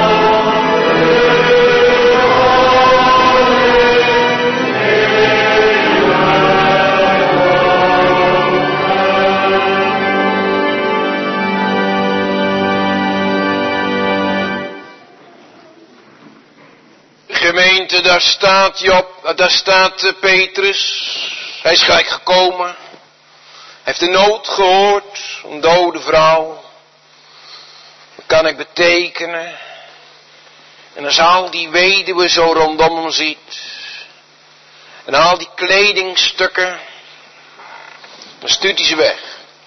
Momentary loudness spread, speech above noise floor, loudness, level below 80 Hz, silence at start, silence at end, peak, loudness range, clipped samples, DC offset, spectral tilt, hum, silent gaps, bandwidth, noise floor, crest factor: 10 LU; 34 dB; -11 LUFS; -44 dBFS; 0 s; 0.25 s; 0 dBFS; 8 LU; under 0.1%; under 0.1%; -3.5 dB/octave; none; none; 6.4 kHz; -46 dBFS; 14 dB